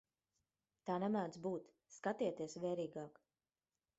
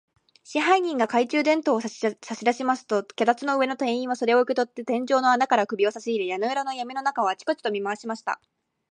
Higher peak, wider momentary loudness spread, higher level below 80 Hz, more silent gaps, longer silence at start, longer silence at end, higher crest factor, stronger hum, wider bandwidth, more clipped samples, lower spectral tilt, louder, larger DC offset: second, -26 dBFS vs -6 dBFS; first, 13 LU vs 8 LU; about the same, -84 dBFS vs -80 dBFS; neither; first, 0.85 s vs 0.5 s; first, 0.9 s vs 0.55 s; about the same, 20 dB vs 20 dB; neither; second, 8 kHz vs 10 kHz; neither; first, -6 dB/octave vs -4 dB/octave; second, -43 LUFS vs -24 LUFS; neither